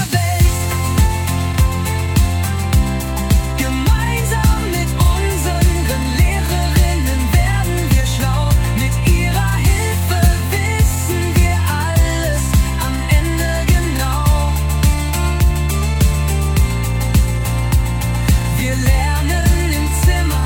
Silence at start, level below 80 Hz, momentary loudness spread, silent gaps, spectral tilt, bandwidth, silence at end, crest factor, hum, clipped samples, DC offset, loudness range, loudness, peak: 0 s; -18 dBFS; 3 LU; none; -5 dB/octave; 19 kHz; 0 s; 14 dB; none; under 0.1%; under 0.1%; 1 LU; -16 LUFS; -2 dBFS